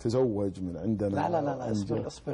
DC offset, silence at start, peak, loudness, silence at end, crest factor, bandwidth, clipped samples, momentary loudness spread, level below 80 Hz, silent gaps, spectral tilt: under 0.1%; 0 s; -16 dBFS; -30 LUFS; 0 s; 12 dB; 11 kHz; under 0.1%; 6 LU; -52 dBFS; none; -7.5 dB/octave